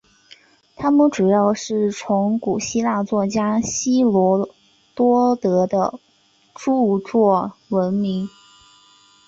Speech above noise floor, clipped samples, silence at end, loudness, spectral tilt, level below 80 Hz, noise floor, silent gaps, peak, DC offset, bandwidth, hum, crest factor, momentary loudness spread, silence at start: 34 dB; under 0.1%; 1 s; -19 LUFS; -6 dB/octave; -58 dBFS; -52 dBFS; none; -4 dBFS; under 0.1%; 8 kHz; none; 16 dB; 8 LU; 0.8 s